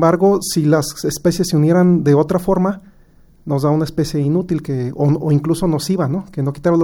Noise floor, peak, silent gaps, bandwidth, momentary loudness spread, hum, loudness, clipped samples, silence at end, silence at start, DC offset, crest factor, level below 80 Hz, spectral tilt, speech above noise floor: -47 dBFS; -2 dBFS; none; 17.5 kHz; 8 LU; none; -16 LUFS; under 0.1%; 0 s; 0 s; under 0.1%; 14 dB; -42 dBFS; -7 dB/octave; 32 dB